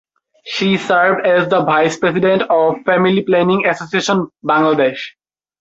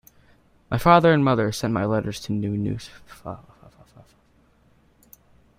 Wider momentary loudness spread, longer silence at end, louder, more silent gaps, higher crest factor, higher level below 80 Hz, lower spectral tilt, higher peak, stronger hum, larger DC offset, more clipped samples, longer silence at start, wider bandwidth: second, 5 LU vs 23 LU; second, 0.5 s vs 2.2 s; first, -14 LUFS vs -21 LUFS; neither; second, 14 dB vs 22 dB; second, -58 dBFS vs -48 dBFS; about the same, -5.5 dB/octave vs -6.5 dB/octave; about the same, 0 dBFS vs -2 dBFS; neither; neither; neither; second, 0.45 s vs 0.7 s; second, 8 kHz vs 16 kHz